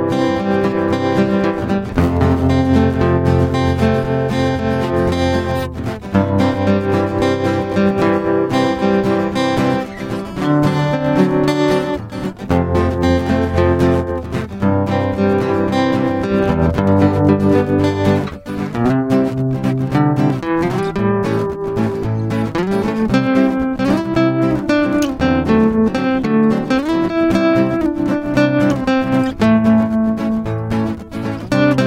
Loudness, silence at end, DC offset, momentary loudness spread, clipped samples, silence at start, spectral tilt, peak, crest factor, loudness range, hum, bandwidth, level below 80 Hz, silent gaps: -16 LUFS; 0 s; under 0.1%; 6 LU; under 0.1%; 0 s; -7.5 dB/octave; 0 dBFS; 16 dB; 2 LU; none; 16 kHz; -38 dBFS; none